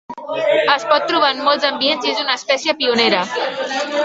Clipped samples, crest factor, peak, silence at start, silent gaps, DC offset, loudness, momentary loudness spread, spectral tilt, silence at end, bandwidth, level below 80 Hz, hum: under 0.1%; 16 dB; 0 dBFS; 0.1 s; none; under 0.1%; -16 LUFS; 7 LU; -2.5 dB/octave; 0 s; 8 kHz; -64 dBFS; none